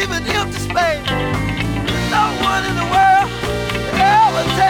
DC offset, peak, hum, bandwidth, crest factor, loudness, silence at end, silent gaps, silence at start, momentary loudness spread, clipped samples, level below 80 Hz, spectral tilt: under 0.1%; -2 dBFS; none; 18 kHz; 14 dB; -16 LUFS; 0 s; none; 0 s; 8 LU; under 0.1%; -32 dBFS; -4.5 dB/octave